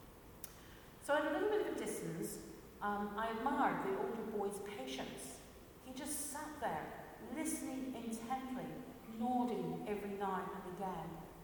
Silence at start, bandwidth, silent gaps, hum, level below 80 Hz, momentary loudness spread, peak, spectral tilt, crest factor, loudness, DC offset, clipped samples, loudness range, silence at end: 0 s; 19 kHz; none; none; -66 dBFS; 15 LU; -22 dBFS; -4.5 dB/octave; 18 dB; -42 LUFS; under 0.1%; under 0.1%; 5 LU; 0 s